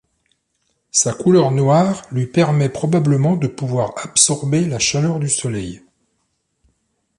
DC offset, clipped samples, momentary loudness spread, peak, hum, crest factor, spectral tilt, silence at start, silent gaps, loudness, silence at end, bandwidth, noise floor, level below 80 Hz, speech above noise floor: under 0.1%; under 0.1%; 7 LU; 0 dBFS; none; 18 dB; -5 dB/octave; 0.95 s; none; -17 LUFS; 1.4 s; 11.5 kHz; -69 dBFS; -52 dBFS; 53 dB